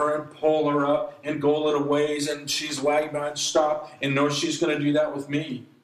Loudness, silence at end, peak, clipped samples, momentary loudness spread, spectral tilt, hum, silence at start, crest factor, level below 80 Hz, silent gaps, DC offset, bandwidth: -24 LUFS; 0.2 s; -8 dBFS; under 0.1%; 6 LU; -4 dB/octave; none; 0 s; 16 dB; -68 dBFS; none; under 0.1%; 14.5 kHz